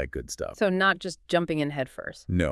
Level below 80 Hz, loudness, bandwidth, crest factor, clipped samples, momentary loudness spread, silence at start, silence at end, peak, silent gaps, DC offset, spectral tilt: -48 dBFS; -27 LUFS; 12 kHz; 18 dB; under 0.1%; 11 LU; 0 s; 0 s; -10 dBFS; none; under 0.1%; -5 dB/octave